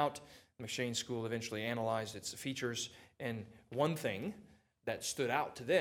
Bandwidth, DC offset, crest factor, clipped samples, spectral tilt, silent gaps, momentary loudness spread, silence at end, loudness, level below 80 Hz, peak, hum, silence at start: 18 kHz; under 0.1%; 22 dB; under 0.1%; -4 dB/octave; none; 11 LU; 0 s; -39 LUFS; -76 dBFS; -18 dBFS; none; 0 s